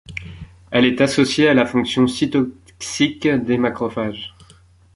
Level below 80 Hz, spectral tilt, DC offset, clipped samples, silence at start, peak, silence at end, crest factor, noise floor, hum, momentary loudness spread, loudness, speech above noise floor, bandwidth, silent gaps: -48 dBFS; -5 dB/octave; under 0.1%; under 0.1%; 0.1 s; -2 dBFS; 0.65 s; 18 dB; -50 dBFS; none; 18 LU; -18 LUFS; 32 dB; 11.5 kHz; none